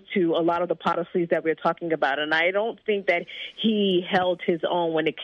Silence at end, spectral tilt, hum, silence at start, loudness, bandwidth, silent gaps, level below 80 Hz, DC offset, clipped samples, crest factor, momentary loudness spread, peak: 0 s; -7 dB/octave; none; 0.1 s; -24 LUFS; 7.2 kHz; none; -70 dBFS; under 0.1%; under 0.1%; 16 dB; 5 LU; -8 dBFS